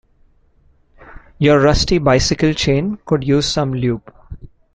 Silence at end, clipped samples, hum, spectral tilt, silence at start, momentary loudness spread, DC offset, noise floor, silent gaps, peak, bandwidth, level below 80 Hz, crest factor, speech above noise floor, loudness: 0.25 s; under 0.1%; none; -5.5 dB/octave; 1.05 s; 7 LU; under 0.1%; -54 dBFS; none; -2 dBFS; 9.2 kHz; -32 dBFS; 16 dB; 39 dB; -16 LUFS